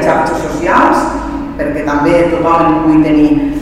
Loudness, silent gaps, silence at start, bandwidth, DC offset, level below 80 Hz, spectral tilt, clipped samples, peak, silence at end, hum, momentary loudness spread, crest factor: -11 LUFS; none; 0 s; 11.5 kHz; 0.4%; -30 dBFS; -6.5 dB/octave; 0.1%; 0 dBFS; 0 s; none; 8 LU; 10 dB